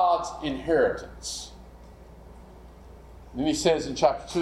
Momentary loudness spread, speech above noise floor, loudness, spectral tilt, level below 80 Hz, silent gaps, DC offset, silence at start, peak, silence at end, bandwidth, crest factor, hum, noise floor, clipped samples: 12 LU; 21 dB; -26 LUFS; -4 dB/octave; -48 dBFS; none; under 0.1%; 0 s; -6 dBFS; 0 s; 14 kHz; 20 dB; none; -47 dBFS; under 0.1%